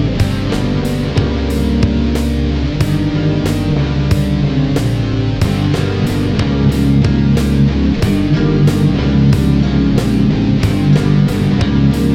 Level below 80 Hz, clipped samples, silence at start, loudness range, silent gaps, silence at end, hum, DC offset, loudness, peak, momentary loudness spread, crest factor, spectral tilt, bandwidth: -22 dBFS; under 0.1%; 0 s; 3 LU; none; 0 s; none; under 0.1%; -14 LUFS; 0 dBFS; 4 LU; 12 dB; -7.5 dB/octave; 15.5 kHz